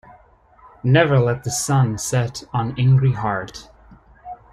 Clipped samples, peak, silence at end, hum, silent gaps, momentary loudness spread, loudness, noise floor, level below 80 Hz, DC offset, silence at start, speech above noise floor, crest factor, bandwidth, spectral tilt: under 0.1%; -2 dBFS; 0.15 s; none; none; 18 LU; -19 LUFS; -51 dBFS; -48 dBFS; under 0.1%; 0.85 s; 33 dB; 18 dB; 13 kHz; -5.5 dB/octave